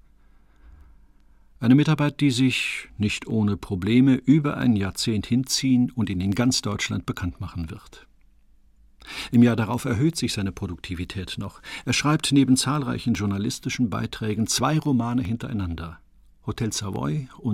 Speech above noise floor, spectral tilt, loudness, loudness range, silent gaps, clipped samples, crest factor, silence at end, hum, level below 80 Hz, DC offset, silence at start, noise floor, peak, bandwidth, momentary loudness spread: 33 dB; -5 dB/octave; -23 LUFS; 5 LU; none; under 0.1%; 16 dB; 0 s; none; -48 dBFS; under 0.1%; 0.65 s; -56 dBFS; -6 dBFS; 15.5 kHz; 14 LU